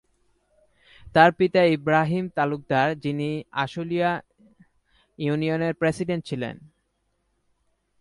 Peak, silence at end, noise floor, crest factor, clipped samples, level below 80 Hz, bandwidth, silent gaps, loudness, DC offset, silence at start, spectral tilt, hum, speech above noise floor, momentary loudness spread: -4 dBFS; 1.35 s; -72 dBFS; 22 dB; under 0.1%; -58 dBFS; 11.5 kHz; none; -23 LUFS; under 0.1%; 1 s; -7 dB/octave; none; 50 dB; 11 LU